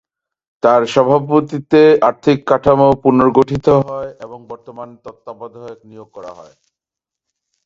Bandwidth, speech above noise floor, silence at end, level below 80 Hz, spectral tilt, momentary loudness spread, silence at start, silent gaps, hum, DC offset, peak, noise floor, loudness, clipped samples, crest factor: 7.8 kHz; 71 dB; 1.25 s; -48 dBFS; -7.5 dB/octave; 23 LU; 0.65 s; none; none; under 0.1%; 0 dBFS; -85 dBFS; -13 LUFS; under 0.1%; 16 dB